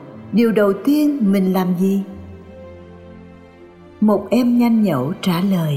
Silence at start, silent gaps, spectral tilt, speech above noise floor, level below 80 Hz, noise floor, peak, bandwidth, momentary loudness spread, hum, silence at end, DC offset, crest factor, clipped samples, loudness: 0 s; none; -7.5 dB/octave; 26 dB; -56 dBFS; -42 dBFS; -4 dBFS; 16 kHz; 23 LU; none; 0 s; under 0.1%; 14 dB; under 0.1%; -17 LUFS